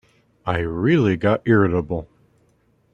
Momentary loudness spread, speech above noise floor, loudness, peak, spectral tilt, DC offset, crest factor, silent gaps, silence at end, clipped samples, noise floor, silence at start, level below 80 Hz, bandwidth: 12 LU; 43 dB; -20 LUFS; -4 dBFS; -8.5 dB/octave; under 0.1%; 18 dB; none; 0.9 s; under 0.1%; -61 dBFS; 0.45 s; -46 dBFS; 7.2 kHz